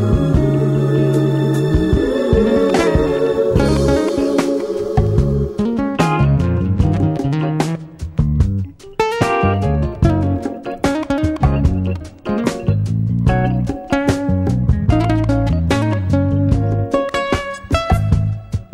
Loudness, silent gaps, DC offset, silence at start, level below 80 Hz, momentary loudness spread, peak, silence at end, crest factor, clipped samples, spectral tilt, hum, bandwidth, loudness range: -17 LUFS; none; under 0.1%; 0 s; -26 dBFS; 6 LU; 0 dBFS; 0.1 s; 16 dB; under 0.1%; -7.5 dB/octave; none; 13.5 kHz; 3 LU